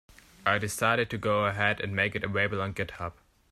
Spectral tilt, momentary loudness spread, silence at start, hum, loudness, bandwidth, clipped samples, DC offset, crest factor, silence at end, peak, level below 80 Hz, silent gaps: -4.5 dB/octave; 8 LU; 0.45 s; none; -28 LUFS; 14.5 kHz; under 0.1%; under 0.1%; 20 dB; 0.4 s; -10 dBFS; -58 dBFS; none